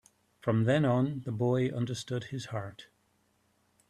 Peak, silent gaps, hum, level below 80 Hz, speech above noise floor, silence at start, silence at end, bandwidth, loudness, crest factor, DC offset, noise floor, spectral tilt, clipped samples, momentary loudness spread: -16 dBFS; none; none; -68 dBFS; 42 dB; 0.45 s; 1.05 s; 11.5 kHz; -31 LUFS; 16 dB; under 0.1%; -72 dBFS; -7 dB/octave; under 0.1%; 12 LU